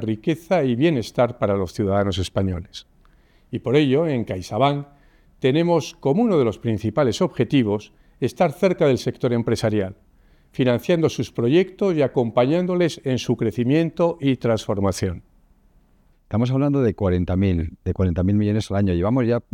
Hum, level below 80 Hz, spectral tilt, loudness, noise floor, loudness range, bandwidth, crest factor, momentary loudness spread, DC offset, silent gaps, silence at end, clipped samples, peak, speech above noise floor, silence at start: none; -48 dBFS; -7 dB/octave; -21 LUFS; -57 dBFS; 3 LU; 16.5 kHz; 16 dB; 7 LU; under 0.1%; none; 0.15 s; under 0.1%; -4 dBFS; 37 dB; 0 s